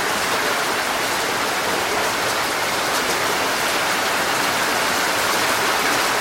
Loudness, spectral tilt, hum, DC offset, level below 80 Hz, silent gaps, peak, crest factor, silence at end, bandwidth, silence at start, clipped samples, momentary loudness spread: -19 LUFS; -1 dB/octave; none; under 0.1%; -52 dBFS; none; -6 dBFS; 14 dB; 0 s; 16 kHz; 0 s; under 0.1%; 2 LU